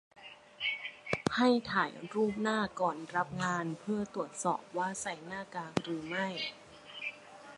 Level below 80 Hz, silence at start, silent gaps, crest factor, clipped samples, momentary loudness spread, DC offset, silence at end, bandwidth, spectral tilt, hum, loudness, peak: -68 dBFS; 0.15 s; none; 22 dB; under 0.1%; 12 LU; under 0.1%; 0 s; 11.5 kHz; -4.5 dB/octave; none; -35 LUFS; -14 dBFS